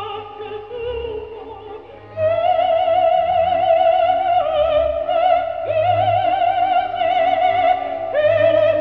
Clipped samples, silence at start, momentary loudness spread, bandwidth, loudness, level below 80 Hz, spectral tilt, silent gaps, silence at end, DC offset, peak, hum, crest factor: under 0.1%; 0 s; 16 LU; 5 kHz; -17 LUFS; -46 dBFS; -7 dB/octave; none; 0 s; 0.2%; -4 dBFS; none; 12 dB